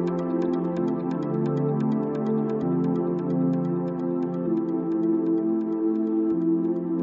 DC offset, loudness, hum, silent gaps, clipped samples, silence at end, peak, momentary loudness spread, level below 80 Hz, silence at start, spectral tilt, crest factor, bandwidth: under 0.1%; -25 LUFS; none; none; under 0.1%; 0 s; -14 dBFS; 3 LU; -64 dBFS; 0 s; -10.5 dB/octave; 10 dB; 5.4 kHz